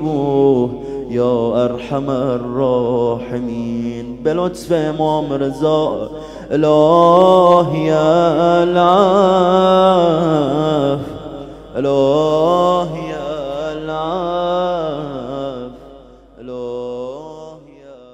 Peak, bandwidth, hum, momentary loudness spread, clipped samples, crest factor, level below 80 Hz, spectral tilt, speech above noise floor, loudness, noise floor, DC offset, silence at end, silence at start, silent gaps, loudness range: 0 dBFS; 10.5 kHz; none; 15 LU; under 0.1%; 16 dB; -44 dBFS; -7 dB/octave; 27 dB; -15 LUFS; -41 dBFS; under 0.1%; 0.2 s; 0 s; none; 11 LU